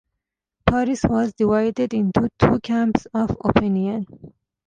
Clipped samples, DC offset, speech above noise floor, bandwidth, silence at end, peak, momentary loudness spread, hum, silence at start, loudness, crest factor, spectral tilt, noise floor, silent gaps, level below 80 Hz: under 0.1%; under 0.1%; 62 dB; 9.2 kHz; 0.4 s; -2 dBFS; 5 LU; none; 0.65 s; -21 LUFS; 20 dB; -7.5 dB/octave; -82 dBFS; none; -40 dBFS